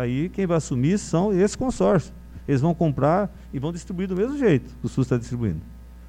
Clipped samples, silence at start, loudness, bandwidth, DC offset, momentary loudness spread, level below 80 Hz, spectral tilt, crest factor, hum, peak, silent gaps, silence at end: under 0.1%; 0 s; -23 LUFS; 10.5 kHz; under 0.1%; 9 LU; -42 dBFS; -7 dB/octave; 16 dB; none; -6 dBFS; none; 0 s